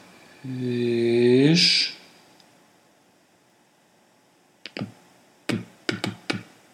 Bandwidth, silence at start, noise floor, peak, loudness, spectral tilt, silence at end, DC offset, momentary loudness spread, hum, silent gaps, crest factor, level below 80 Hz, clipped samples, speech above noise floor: 13 kHz; 0.45 s; -60 dBFS; -6 dBFS; -22 LUFS; -4.5 dB/octave; 0.3 s; under 0.1%; 22 LU; none; none; 20 dB; -76 dBFS; under 0.1%; 39 dB